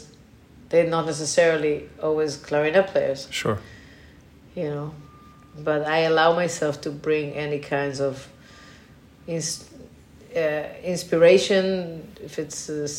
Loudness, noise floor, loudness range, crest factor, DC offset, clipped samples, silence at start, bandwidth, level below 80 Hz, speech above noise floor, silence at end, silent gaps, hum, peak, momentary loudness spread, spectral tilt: -23 LUFS; -50 dBFS; 7 LU; 20 dB; under 0.1%; under 0.1%; 0 s; 16 kHz; -56 dBFS; 27 dB; 0 s; none; none; -4 dBFS; 14 LU; -4.5 dB/octave